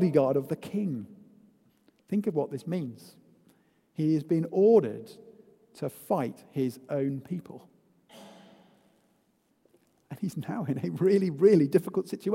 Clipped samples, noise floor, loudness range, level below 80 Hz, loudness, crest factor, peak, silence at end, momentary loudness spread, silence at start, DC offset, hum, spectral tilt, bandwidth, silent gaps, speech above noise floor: under 0.1%; -70 dBFS; 11 LU; -74 dBFS; -28 LUFS; 20 dB; -10 dBFS; 0 s; 17 LU; 0 s; under 0.1%; none; -8.5 dB/octave; 16 kHz; none; 43 dB